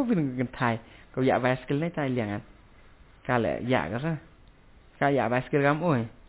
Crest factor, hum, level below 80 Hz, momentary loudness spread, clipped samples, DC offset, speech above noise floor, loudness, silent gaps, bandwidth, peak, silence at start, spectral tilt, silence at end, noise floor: 18 dB; none; -54 dBFS; 10 LU; under 0.1%; under 0.1%; 28 dB; -28 LUFS; none; 4 kHz; -10 dBFS; 0 s; -11 dB/octave; 0.15 s; -54 dBFS